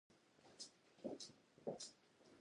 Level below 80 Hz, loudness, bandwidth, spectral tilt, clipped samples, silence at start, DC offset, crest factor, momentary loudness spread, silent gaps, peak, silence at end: under -90 dBFS; -55 LUFS; 11 kHz; -3.5 dB/octave; under 0.1%; 0.1 s; under 0.1%; 22 dB; 10 LU; none; -36 dBFS; 0 s